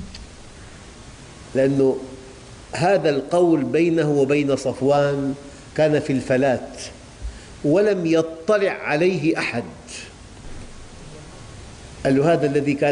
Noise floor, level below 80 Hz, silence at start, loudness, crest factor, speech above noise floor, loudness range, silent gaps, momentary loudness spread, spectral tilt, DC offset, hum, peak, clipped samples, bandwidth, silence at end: -41 dBFS; -46 dBFS; 0 s; -20 LUFS; 14 dB; 22 dB; 5 LU; none; 23 LU; -6.5 dB/octave; under 0.1%; none; -8 dBFS; under 0.1%; 10.5 kHz; 0 s